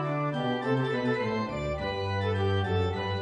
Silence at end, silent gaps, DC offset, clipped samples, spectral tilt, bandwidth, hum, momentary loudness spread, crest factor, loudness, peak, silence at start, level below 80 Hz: 0 s; none; under 0.1%; under 0.1%; -7.5 dB/octave; 9.4 kHz; none; 4 LU; 12 dB; -29 LUFS; -16 dBFS; 0 s; -50 dBFS